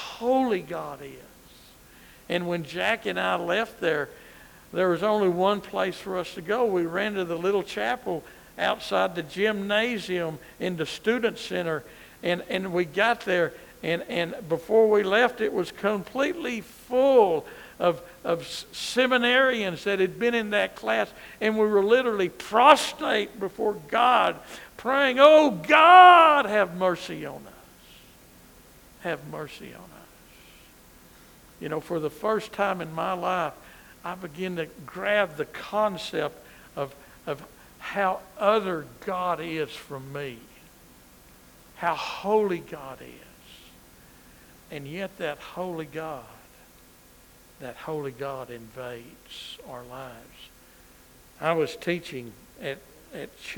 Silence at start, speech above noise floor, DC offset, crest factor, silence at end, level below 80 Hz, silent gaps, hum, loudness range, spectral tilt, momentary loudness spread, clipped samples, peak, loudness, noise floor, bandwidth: 0 s; 29 dB; under 0.1%; 24 dB; 0 s; -60 dBFS; none; none; 19 LU; -4.5 dB/octave; 19 LU; under 0.1%; 0 dBFS; -24 LUFS; -54 dBFS; over 20 kHz